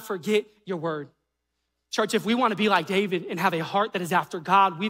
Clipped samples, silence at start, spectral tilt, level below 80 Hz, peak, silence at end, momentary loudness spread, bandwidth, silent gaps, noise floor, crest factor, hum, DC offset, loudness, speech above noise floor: under 0.1%; 0 s; -4.5 dB/octave; -74 dBFS; -8 dBFS; 0 s; 10 LU; 16 kHz; none; -79 dBFS; 18 dB; none; under 0.1%; -25 LUFS; 55 dB